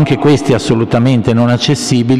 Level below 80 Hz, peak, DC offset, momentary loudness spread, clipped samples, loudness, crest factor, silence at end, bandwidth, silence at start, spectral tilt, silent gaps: -40 dBFS; 0 dBFS; under 0.1%; 2 LU; under 0.1%; -11 LUFS; 10 dB; 0 s; 13 kHz; 0 s; -6 dB/octave; none